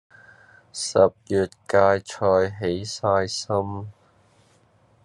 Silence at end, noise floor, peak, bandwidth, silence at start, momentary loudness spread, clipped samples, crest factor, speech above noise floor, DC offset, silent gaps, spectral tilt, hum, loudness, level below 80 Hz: 1.15 s; -59 dBFS; -4 dBFS; 11.5 kHz; 0.75 s; 12 LU; under 0.1%; 20 dB; 37 dB; under 0.1%; none; -4.5 dB/octave; none; -23 LUFS; -64 dBFS